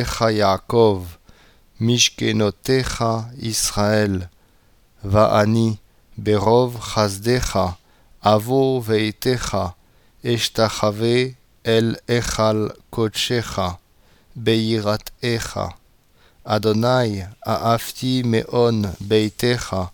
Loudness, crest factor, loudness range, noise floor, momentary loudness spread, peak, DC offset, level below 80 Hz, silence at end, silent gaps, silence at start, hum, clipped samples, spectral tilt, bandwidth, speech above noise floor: -20 LUFS; 18 dB; 3 LU; -56 dBFS; 10 LU; -2 dBFS; under 0.1%; -42 dBFS; 0.05 s; none; 0 s; none; under 0.1%; -5 dB/octave; 20 kHz; 37 dB